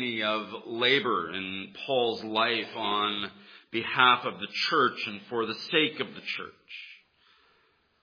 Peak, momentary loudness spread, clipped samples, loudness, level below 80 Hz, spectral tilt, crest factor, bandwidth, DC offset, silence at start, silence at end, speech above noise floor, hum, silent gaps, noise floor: -6 dBFS; 14 LU; under 0.1%; -27 LUFS; -76 dBFS; -4.5 dB/octave; 24 dB; 5.4 kHz; under 0.1%; 0 s; 1.05 s; 39 dB; none; none; -68 dBFS